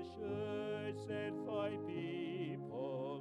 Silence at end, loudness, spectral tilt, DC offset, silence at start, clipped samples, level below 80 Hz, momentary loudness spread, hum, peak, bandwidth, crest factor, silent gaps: 0 s; -43 LUFS; -7.5 dB/octave; under 0.1%; 0 s; under 0.1%; -76 dBFS; 3 LU; none; -30 dBFS; 11 kHz; 14 dB; none